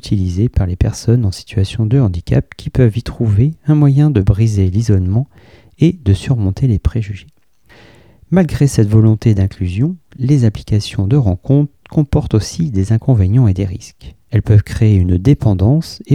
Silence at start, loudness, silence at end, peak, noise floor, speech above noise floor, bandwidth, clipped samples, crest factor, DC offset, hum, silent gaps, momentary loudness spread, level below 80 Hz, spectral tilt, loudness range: 0.05 s; -14 LUFS; 0 s; 0 dBFS; -47 dBFS; 34 dB; 11 kHz; under 0.1%; 14 dB; 0.3%; none; none; 7 LU; -30 dBFS; -8 dB/octave; 3 LU